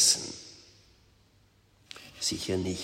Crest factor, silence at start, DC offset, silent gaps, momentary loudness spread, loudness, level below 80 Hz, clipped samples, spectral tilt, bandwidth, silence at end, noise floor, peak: 24 dB; 0 s; under 0.1%; none; 22 LU; -29 LUFS; -62 dBFS; under 0.1%; -2 dB/octave; 16 kHz; 0 s; -64 dBFS; -10 dBFS